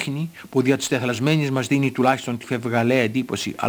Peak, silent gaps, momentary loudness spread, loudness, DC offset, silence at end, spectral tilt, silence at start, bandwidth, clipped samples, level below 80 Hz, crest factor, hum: -4 dBFS; none; 7 LU; -21 LUFS; under 0.1%; 0 s; -5.5 dB/octave; 0 s; over 20 kHz; under 0.1%; -64 dBFS; 18 dB; none